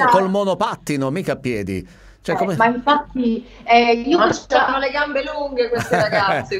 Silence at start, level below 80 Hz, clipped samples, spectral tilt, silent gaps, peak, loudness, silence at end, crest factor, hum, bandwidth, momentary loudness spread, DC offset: 0 s; -46 dBFS; under 0.1%; -5 dB/octave; none; 0 dBFS; -18 LUFS; 0 s; 18 dB; none; 16 kHz; 9 LU; under 0.1%